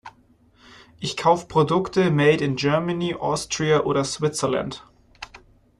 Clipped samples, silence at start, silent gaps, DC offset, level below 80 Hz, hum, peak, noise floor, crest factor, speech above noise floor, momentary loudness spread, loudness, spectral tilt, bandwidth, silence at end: under 0.1%; 0.05 s; none; under 0.1%; -54 dBFS; none; -4 dBFS; -57 dBFS; 20 dB; 36 dB; 19 LU; -22 LUFS; -5 dB/octave; 12.5 kHz; 0.45 s